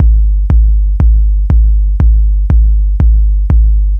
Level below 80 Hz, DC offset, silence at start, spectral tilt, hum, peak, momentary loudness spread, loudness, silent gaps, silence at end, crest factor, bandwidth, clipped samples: -8 dBFS; under 0.1%; 0 s; -11 dB/octave; none; 0 dBFS; 2 LU; -11 LUFS; none; 0 s; 8 dB; 1.8 kHz; 0.1%